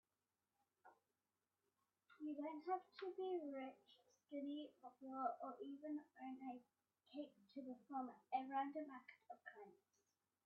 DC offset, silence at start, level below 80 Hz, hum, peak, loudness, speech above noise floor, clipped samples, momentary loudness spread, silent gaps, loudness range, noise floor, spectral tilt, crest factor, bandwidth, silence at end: under 0.1%; 0.85 s; under -90 dBFS; none; -32 dBFS; -52 LUFS; over 39 dB; under 0.1%; 13 LU; none; 3 LU; under -90 dBFS; -2.5 dB/octave; 20 dB; 5.8 kHz; 0.7 s